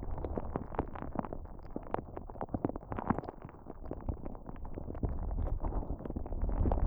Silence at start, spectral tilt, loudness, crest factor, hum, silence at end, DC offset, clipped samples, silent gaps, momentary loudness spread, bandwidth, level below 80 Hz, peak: 0 s; -11.5 dB/octave; -40 LUFS; 22 dB; none; 0 s; under 0.1%; under 0.1%; none; 11 LU; 3.6 kHz; -40 dBFS; -14 dBFS